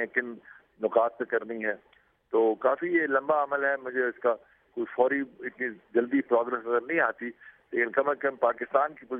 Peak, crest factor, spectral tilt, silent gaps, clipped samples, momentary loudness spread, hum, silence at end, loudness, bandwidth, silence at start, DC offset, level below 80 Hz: -8 dBFS; 20 dB; -9 dB/octave; none; under 0.1%; 10 LU; none; 0 s; -28 LUFS; 3.7 kHz; 0 s; under 0.1%; -78 dBFS